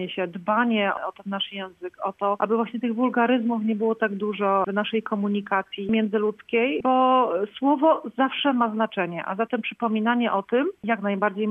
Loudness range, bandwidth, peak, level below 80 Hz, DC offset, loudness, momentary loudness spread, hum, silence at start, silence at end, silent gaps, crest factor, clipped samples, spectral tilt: 3 LU; 3.8 kHz; -8 dBFS; -68 dBFS; under 0.1%; -24 LUFS; 8 LU; none; 0 s; 0 s; none; 16 dB; under 0.1%; -8 dB/octave